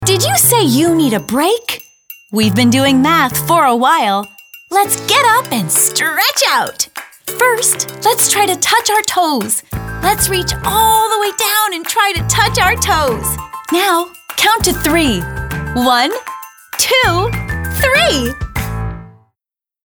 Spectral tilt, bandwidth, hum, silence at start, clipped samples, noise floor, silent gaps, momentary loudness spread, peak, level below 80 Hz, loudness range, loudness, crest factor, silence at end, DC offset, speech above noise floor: -3 dB/octave; over 20 kHz; none; 0 s; under 0.1%; -85 dBFS; none; 11 LU; 0 dBFS; -34 dBFS; 2 LU; -12 LUFS; 14 dB; 0.75 s; under 0.1%; 72 dB